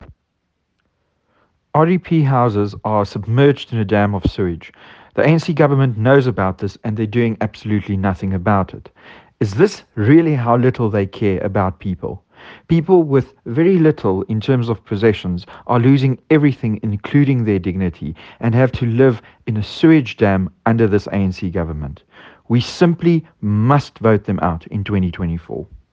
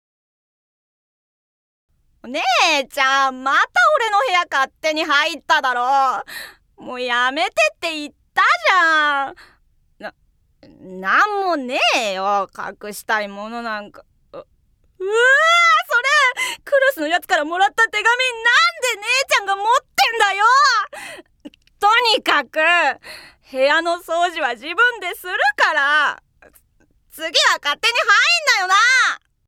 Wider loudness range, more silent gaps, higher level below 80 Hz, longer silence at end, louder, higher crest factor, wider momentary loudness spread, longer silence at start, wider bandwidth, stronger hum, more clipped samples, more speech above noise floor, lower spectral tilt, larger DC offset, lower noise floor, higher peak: second, 2 LU vs 5 LU; neither; first, -44 dBFS vs -62 dBFS; second, 0.15 s vs 0.3 s; about the same, -17 LUFS vs -16 LUFS; about the same, 16 dB vs 18 dB; second, 10 LU vs 15 LU; second, 0 s vs 2.25 s; second, 7.8 kHz vs 18.5 kHz; neither; neither; first, 54 dB vs 43 dB; first, -8.5 dB/octave vs 0 dB/octave; neither; first, -70 dBFS vs -60 dBFS; about the same, 0 dBFS vs -2 dBFS